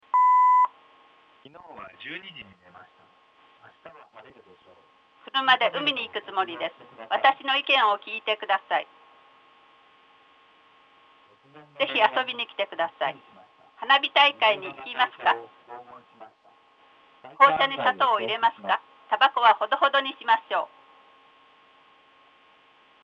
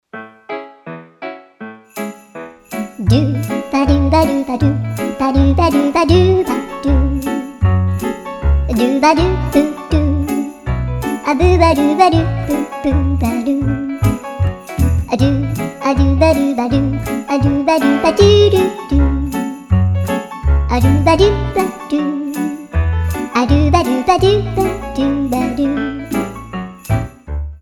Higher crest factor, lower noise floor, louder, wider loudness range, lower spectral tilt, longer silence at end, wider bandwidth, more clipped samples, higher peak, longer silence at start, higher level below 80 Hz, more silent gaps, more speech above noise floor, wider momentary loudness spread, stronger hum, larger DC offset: first, 24 dB vs 14 dB; first, -58 dBFS vs -34 dBFS; second, -23 LUFS vs -15 LUFS; first, 12 LU vs 3 LU; second, -3.5 dB/octave vs -7 dB/octave; first, 2.35 s vs 0.05 s; second, 7.4 kHz vs 18.5 kHz; neither; second, -4 dBFS vs 0 dBFS; about the same, 0.15 s vs 0.15 s; second, -80 dBFS vs -24 dBFS; neither; first, 33 dB vs 22 dB; first, 19 LU vs 15 LU; neither; neither